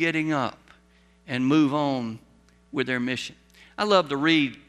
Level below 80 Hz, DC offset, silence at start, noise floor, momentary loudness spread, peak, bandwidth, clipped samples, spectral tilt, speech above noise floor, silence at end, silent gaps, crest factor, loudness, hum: -62 dBFS; under 0.1%; 0 s; -59 dBFS; 14 LU; -6 dBFS; 11 kHz; under 0.1%; -5.5 dB/octave; 35 dB; 0.1 s; none; 20 dB; -24 LUFS; none